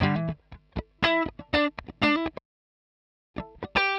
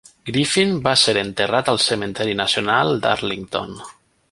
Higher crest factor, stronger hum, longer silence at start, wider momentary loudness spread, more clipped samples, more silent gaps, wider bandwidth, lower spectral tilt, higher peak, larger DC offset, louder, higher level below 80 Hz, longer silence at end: about the same, 18 dB vs 18 dB; neither; second, 0 s vs 0.25 s; first, 17 LU vs 11 LU; neither; first, 2.45-3.34 s vs none; about the same, 10.5 kHz vs 11.5 kHz; first, -6.5 dB/octave vs -3.5 dB/octave; second, -10 dBFS vs -2 dBFS; neither; second, -27 LUFS vs -18 LUFS; about the same, -48 dBFS vs -52 dBFS; second, 0 s vs 0.4 s